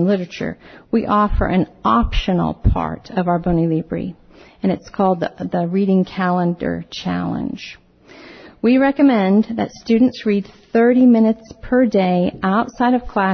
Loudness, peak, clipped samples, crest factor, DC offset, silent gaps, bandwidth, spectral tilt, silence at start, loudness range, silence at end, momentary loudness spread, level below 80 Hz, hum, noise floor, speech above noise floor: -18 LUFS; -4 dBFS; under 0.1%; 14 dB; under 0.1%; none; 6.4 kHz; -8 dB/octave; 0 s; 5 LU; 0 s; 11 LU; -32 dBFS; none; -43 dBFS; 26 dB